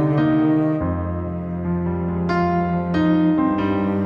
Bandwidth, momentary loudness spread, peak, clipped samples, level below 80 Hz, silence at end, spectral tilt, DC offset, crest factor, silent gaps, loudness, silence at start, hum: 5.8 kHz; 8 LU; -8 dBFS; under 0.1%; -40 dBFS; 0 s; -10 dB/octave; under 0.1%; 12 dB; none; -20 LUFS; 0 s; none